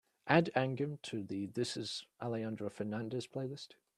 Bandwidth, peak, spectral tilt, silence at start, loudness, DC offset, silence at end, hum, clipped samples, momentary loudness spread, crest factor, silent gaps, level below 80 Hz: 13 kHz; -12 dBFS; -5.5 dB/octave; 0.25 s; -37 LUFS; under 0.1%; 0.3 s; none; under 0.1%; 12 LU; 26 dB; none; -76 dBFS